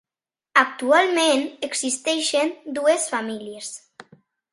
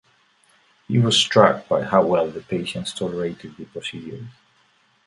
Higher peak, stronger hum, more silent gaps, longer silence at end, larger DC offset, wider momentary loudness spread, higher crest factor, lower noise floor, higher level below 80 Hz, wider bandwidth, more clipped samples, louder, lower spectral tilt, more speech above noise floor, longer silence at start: about the same, 0 dBFS vs 0 dBFS; neither; neither; about the same, 0.75 s vs 0.75 s; neither; second, 15 LU vs 20 LU; about the same, 22 dB vs 22 dB; first, under -90 dBFS vs -61 dBFS; second, -74 dBFS vs -58 dBFS; about the same, 11.5 kHz vs 11.5 kHz; neither; about the same, -21 LUFS vs -20 LUFS; second, -1 dB/octave vs -4.5 dB/octave; first, over 68 dB vs 40 dB; second, 0.55 s vs 0.9 s